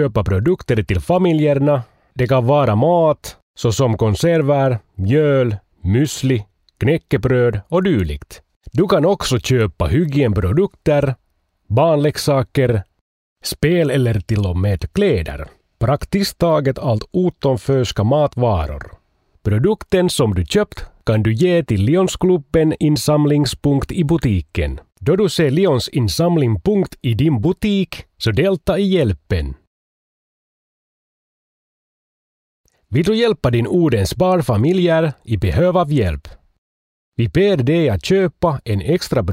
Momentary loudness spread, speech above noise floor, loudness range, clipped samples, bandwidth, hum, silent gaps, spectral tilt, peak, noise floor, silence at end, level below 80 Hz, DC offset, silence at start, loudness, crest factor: 8 LU; over 74 dB; 3 LU; under 0.1%; 16 kHz; none; 3.42-3.54 s, 8.56-8.61 s, 13.01-13.36 s, 29.67-32.64 s, 36.58-37.12 s; -6.5 dB/octave; -4 dBFS; under -90 dBFS; 0 s; -36 dBFS; under 0.1%; 0 s; -17 LUFS; 14 dB